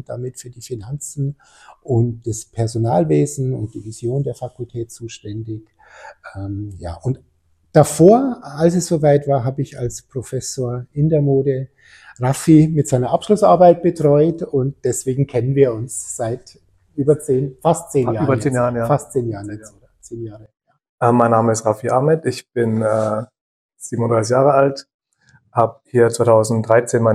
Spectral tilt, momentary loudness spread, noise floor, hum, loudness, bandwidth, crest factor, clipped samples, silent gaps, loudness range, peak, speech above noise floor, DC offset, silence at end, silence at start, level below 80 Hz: -7 dB/octave; 17 LU; -56 dBFS; none; -17 LUFS; 15 kHz; 18 dB; under 0.1%; 20.89-20.98 s, 23.41-23.69 s, 24.94-24.99 s; 7 LU; 0 dBFS; 38 dB; under 0.1%; 0 s; 0.1 s; -48 dBFS